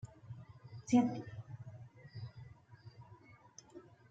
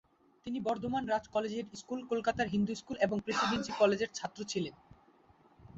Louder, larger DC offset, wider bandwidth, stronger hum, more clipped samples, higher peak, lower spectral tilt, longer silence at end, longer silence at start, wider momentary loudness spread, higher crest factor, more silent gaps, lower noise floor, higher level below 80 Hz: second, -37 LUFS vs -34 LUFS; neither; about the same, 7.8 kHz vs 8 kHz; neither; neither; second, -18 dBFS vs -14 dBFS; first, -6.5 dB/octave vs -4 dB/octave; first, 0.25 s vs 0 s; second, 0.05 s vs 0.45 s; first, 27 LU vs 12 LU; about the same, 22 dB vs 20 dB; neither; about the same, -61 dBFS vs -64 dBFS; second, -72 dBFS vs -64 dBFS